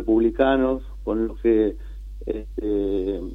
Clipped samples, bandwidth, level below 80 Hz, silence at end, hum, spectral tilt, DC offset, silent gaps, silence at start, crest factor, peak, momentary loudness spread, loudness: under 0.1%; 4 kHz; -36 dBFS; 0 s; none; -8.5 dB/octave; under 0.1%; none; 0 s; 18 dB; -6 dBFS; 12 LU; -23 LUFS